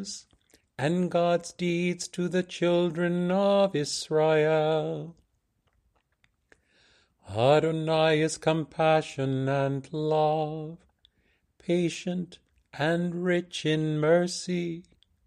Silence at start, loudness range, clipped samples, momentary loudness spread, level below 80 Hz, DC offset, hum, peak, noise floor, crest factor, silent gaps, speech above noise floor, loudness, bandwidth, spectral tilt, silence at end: 0 s; 5 LU; under 0.1%; 13 LU; -66 dBFS; under 0.1%; none; -10 dBFS; -73 dBFS; 18 dB; none; 47 dB; -27 LUFS; 12 kHz; -5.5 dB/octave; 0.45 s